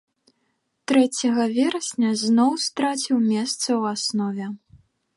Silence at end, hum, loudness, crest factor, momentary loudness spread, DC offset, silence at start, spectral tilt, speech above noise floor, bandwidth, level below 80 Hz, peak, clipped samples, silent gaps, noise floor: 0.6 s; none; -22 LUFS; 16 dB; 9 LU; under 0.1%; 0.9 s; -3.5 dB/octave; 51 dB; 11.5 kHz; -70 dBFS; -6 dBFS; under 0.1%; none; -72 dBFS